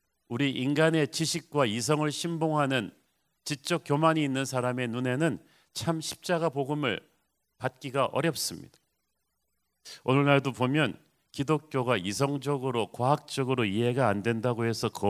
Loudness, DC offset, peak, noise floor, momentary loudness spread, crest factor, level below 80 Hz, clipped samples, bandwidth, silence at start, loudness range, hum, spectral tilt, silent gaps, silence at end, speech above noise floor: -28 LUFS; under 0.1%; -6 dBFS; -80 dBFS; 11 LU; 22 dB; -64 dBFS; under 0.1%; 16 kHz; 0.3 s; 4 LU; none; -5 dB/octave; none; 0 s; 52 dB